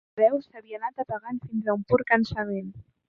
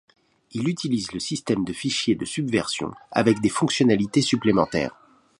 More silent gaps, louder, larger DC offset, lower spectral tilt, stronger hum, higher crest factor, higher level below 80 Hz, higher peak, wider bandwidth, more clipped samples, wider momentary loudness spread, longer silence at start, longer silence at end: neither; second, -27 LUFS vs -23 LUFS; neither; first, -8 dB/octave vs -5 dB/octave; neither; about the same, 20 dB vs 20 dB; about the same, -56 dBFS vs -54 dBFS; about the same, -6 dBFS vs -4 dBFS; second, 6.8 kHz vs 11.5 kHz; neither; first, 12 LU vs 8 LU; second, 0.15 s vs 0.55 s; second, 0.3 s vs 0.5 s